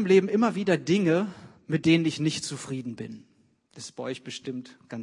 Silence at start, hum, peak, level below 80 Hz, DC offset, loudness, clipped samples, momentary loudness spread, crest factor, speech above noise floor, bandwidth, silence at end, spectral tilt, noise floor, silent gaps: 0 s; none; -8 dBFS; -68 dBFS; under 0.1%; -26 LUFS; under 0.1%; 19 LU; 18 dB; 35 dB; 11 kHz; 0 s; -5.5 dB/octave; -61 dBFS; none